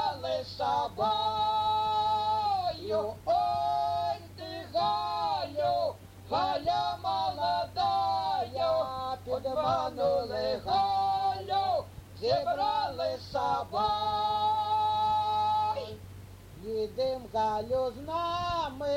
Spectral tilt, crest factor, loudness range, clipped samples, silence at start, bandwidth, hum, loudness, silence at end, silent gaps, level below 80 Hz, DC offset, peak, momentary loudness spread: -5 dB/octave; 14 dB; 2 LU; under 0.1%; 0 s; 16.5 kHz; none; -30 LUFS; 0 s; none; -56 dBFS; under 0.1%; -16 dBFS; 7 LU